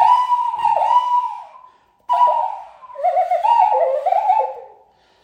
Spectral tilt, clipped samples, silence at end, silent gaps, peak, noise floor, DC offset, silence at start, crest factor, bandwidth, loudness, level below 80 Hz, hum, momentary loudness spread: -1.5 dB/octave; under 0.1%; 0.55 s; none; -2 dBFS; -53 dBFS; under 0.1%; 0 s; 14 dB; 9.4 kHz; -17 LUFS; -68 dBFS; none; 13 LU